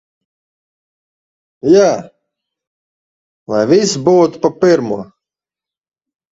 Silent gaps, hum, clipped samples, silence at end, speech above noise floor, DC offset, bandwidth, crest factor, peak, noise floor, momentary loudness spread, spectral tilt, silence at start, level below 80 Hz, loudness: 2.67-3.46 s; none; under 0.1%; 1.25 s; 77 dB; under 0.1%; 8 kHz; 16 dB; 0 dBFS; -88 dBFS; 12 LU; -5.5 dB/octave; 1.65 s; -58 dBFS; -13 LUFS